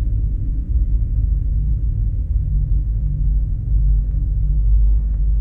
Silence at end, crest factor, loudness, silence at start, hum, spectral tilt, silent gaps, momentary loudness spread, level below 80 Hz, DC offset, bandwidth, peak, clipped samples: 0 s; 10 dB; -21 LUFS; 0 s; none; -12.5 dB/octave; none; 4 LU; -16 dBFS; under 0.1%; 0.6 kHz; -8 dBFS; under 0.1%